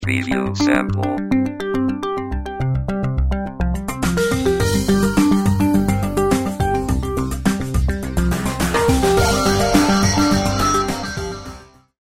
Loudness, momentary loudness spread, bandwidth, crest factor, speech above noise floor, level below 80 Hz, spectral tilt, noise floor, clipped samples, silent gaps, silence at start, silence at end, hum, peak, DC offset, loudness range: -18 LUFS; 8 LU; 16 kHz; 18 dB; 21 dB; -28 dBFS; -5.5 dB/octave; -39 dBFS; under 0.1%; none; 0 s; 0.35 s; none; 0 dBFS; 0.4%; 4 LU